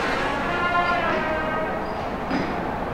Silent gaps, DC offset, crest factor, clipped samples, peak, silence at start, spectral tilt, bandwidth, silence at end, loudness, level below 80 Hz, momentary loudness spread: none; under 0.1%; 16 dB; under 0.1%; -8 dBFS; 0 s; -5.5 dB/octave; 16.5 kHz; 0 s; -24 LUFS; -40 dBFS; 6 LU